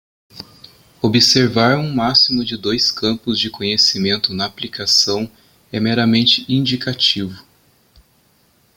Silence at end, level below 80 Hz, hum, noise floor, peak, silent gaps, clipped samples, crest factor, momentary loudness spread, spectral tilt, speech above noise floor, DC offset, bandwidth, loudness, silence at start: 1.35 s; -52 dBFS; none; -57 dBFS; 0 dBFS; none; under 0.1%; 18 dB; 10 LU; -4 dB/octave; 40 dB; under 0.1%; 17 kHz; -15 LUFS; 0.35 s